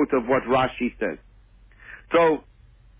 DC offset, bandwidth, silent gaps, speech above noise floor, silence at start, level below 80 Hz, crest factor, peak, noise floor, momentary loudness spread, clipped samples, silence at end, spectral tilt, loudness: under 0.1%; 3.9 kHz; none; 30 dB; 0 s; -50 dBFS; 16 dB; -8 dBFS; -52 dBFS; 21 LU; under 0.1%; 0.6 s; -9.5 dB/octave; -23 LUFS